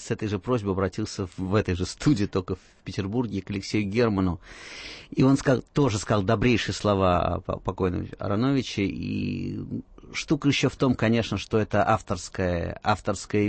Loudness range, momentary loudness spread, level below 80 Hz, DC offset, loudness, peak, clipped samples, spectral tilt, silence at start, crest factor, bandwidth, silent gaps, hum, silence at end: 4 LU; 10 LU; -46 dBFS; under 0.1%; -26 LUFS; -10 dBFS; under 0.1%; -6 dB/octave; 0 s; 16 dB; 8.8 kHz; none; none; 0 s